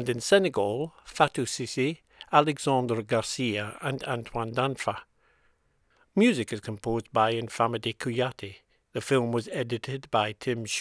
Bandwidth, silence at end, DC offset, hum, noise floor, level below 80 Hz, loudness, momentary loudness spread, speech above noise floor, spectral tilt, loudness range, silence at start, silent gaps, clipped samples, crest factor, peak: 11 kHz; 0 s; under 0.1%; none; -68 dBFS; -60 dBFS; -28 LUFS; 10 LU; 40 dB; -5 dB/octave; 3 LU; 0 s; none; under 0.1%; 24 dB; -4 dBFS